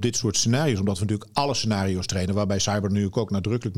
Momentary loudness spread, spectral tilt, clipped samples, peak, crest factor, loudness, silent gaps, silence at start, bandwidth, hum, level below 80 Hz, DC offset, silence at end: 4 LU; -4.5 dB/octave; under 0.1%; -8 dBFS; 16 dB; -24 LUFS; none; 0 s; 15 kHz; none; -54 dBFS; 0.5%; 0 s